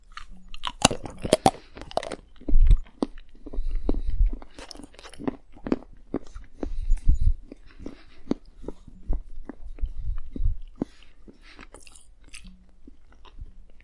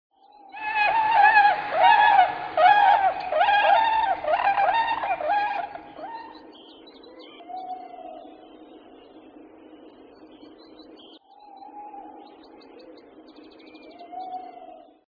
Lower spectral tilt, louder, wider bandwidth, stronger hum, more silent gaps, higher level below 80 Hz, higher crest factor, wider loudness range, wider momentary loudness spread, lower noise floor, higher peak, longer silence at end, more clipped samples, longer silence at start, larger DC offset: about the same, -4.5 dB/octave vs -4.5 dB/octave; second, -30 LUFS vs -20 LUFS; first, 11.5 kHz vs 5.4 kHz; neither; neither; first, -28 dBFS vs -64 dBFS; first, 26 dB vs 20 dB; second, 12 LU vs 24 LU; about the same, 24 LU vs 25 LU; about the same, -46 dBFS vs -49 dBFS; first, 0 dBFS vs -6 dBFS; second, 0.05 s vs 0.4 s; neither; second, 0.1 s vs 0.55 s; neither